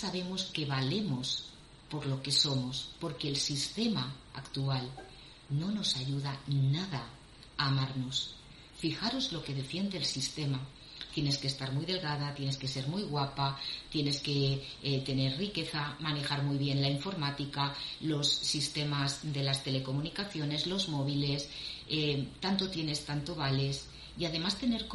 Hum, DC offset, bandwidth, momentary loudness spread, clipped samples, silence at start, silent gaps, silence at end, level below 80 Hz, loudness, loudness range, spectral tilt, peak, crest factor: none; under 0.1%; 11.5 kHz; 8 LU; under 0.1%; 0 s; none; 0 s; -58 dBFS; -33 LUFS; 3 LU; -4.5 dB/octave; -14 dBFS; 20 dB